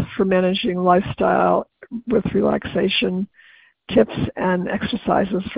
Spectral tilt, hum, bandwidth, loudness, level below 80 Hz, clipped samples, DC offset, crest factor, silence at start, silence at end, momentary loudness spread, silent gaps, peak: -11 dB/octave; none; 5.2 kHz; -20 LUFS; -46 dBFS; under 0.1%; under 0.1%; 18 dB; 0 s; 0 s; 6 LU; none; -2 dBFS